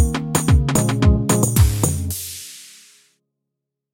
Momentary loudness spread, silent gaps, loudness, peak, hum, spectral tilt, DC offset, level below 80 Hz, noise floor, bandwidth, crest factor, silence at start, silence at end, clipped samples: 15 LU; none; -18 LUFS; 0 dBFS; none; -5 dB/octave; under 0.1%; -26 dBFS; -81 dBFS; 17 kHz; 18 dB; 0 s; 1.25 s; under 0.1%